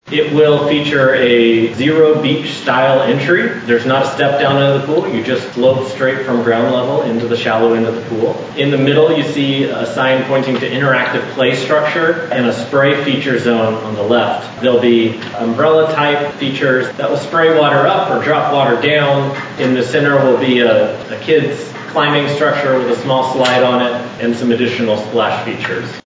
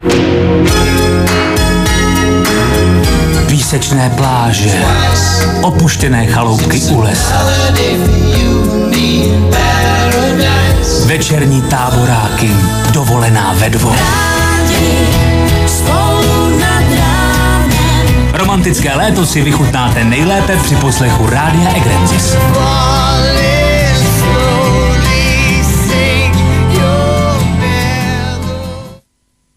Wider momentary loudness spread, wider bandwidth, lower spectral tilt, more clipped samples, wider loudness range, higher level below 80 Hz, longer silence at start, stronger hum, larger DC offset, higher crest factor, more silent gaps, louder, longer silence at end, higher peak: first, 7 LU vs 1 LU; second, 7.8 kHz vs 16 kHz; about the same, -6 dB/octave vs -5 dB/octave; neither; about the same, 2 LU vs 1 LU; second, -56 dBFS vs -18 dBFS; about the same, 0.05 s vs 0 s; neither; neither; about the same, 12 dB vs 10 dB; neither; second, -13 LUFS vs -10 LUFS; second, 0.05 s vs 0.65 s; about the same, 0 dBFS vs 0 dBFS